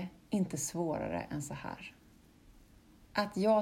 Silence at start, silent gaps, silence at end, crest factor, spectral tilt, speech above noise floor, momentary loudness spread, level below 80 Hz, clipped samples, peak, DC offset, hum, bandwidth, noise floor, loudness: 0 s; none; 0 s; 18 dB; -5 dB/octave; 27 dB; 12 LU; -62 dBFS; under 0.1%; -18 dBFS; under 0.1%; none; 16 kHz; -61 dBFS; -36 LUFS